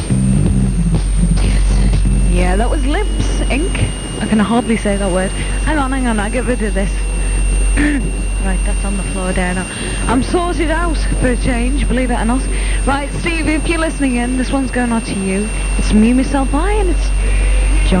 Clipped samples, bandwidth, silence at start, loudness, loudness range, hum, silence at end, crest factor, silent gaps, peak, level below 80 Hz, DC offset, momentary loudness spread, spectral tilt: under 0.1%; 9.8 kHz; 0 s; -16 LUFS; 2 LU; none; 0 s; 12 dB; none; 0 dBFS; -16 dBFS; under 0.1%; 5 LU; -5.5 dB/octave